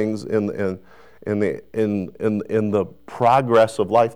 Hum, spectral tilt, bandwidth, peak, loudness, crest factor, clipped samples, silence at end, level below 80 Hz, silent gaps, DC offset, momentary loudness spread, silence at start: none; -7 dB/octave; 13 kHz; -6 dBFS; -21 LUFS; 14 dB; under 0.1%; 0 s; -60 dBFS; none; 0.4%; 10 LU; 0 s